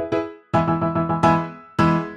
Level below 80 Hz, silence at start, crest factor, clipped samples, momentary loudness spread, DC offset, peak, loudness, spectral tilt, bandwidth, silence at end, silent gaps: -48 dBFS; 0 s; 16 dB; under 0.1%; 7 LU; under 0.1%; -4 dBFS; -21 LUFS; -8 dB/octave; 9.4 kHz; 0 s; none